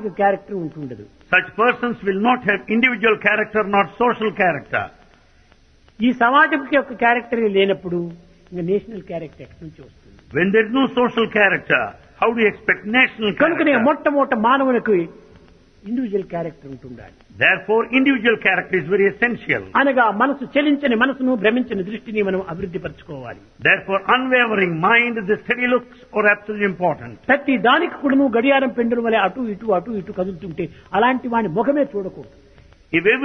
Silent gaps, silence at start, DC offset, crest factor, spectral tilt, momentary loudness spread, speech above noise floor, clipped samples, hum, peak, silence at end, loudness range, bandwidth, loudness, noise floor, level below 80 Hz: none; 0 s; under 0.1%; 18 dB; -7.5 dB/octave; 13 LU; 33 dB; under 0.1%; none; 0 dBFS; 0 s; 4 LU; 6.2 kHz; -18 LUFS; -52 dBFS; -54 dBFS